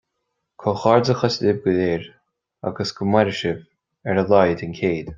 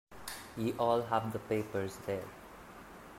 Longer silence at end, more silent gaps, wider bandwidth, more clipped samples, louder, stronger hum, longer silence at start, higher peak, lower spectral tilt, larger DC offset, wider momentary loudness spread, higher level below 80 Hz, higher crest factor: about the same, 0 s vs 0 s; neither; second, 7.6 kHz vs 16 kHz; neither; first, -20 LUFS vs -36 LUFS; neither; first, 0.6 s vs 0.1 s; first, -2 dBFS vs -16 dBFS; about the same, -6.5 dB/octave vs -5.5 dB/octave; neither; second, 11 LU vs 20 LU; first, -54 dBFS vs -64 dBFS; about the same, 20 dB vs 20 dB